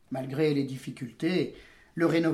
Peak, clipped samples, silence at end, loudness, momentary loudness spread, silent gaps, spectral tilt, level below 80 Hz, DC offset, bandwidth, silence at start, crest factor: -14 dBFS; under 0.1%; 0 s; -30 LUFS; 12 LU; none; -7 dB/octave; -64 dBFS; under 0.1%; 13.5 kHz; 0.1 s; 16 dB